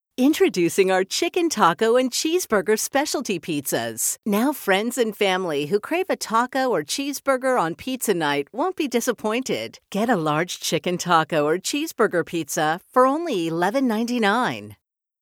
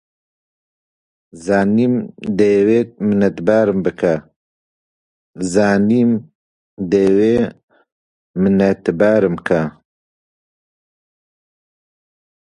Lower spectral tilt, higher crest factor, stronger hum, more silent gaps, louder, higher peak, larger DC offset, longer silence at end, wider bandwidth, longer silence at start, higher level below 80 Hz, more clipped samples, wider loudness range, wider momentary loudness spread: second, -3.5 dB/octave vs -7.5 dB/octave; about the same, 18 dB vs 18 dB; neither; second, none vs 4.36-5.33 s, 6.35-6.77 s, 7.63-7.68 s, 7.92-8.34 s; second, -22 LUFS vs -16 LUFS; second, -4 dBFS vs 0 dBFS; neither; second, 0.45 s vs 2.7 s; first, 19.5 kHz vs 11 kHz; second, 0.2 s vs 1.35 s; second, -66 dBFS vs -50 dBFS; neither; about the same, 3 LU vs 3 LU; second, 6 LU vs 9 LU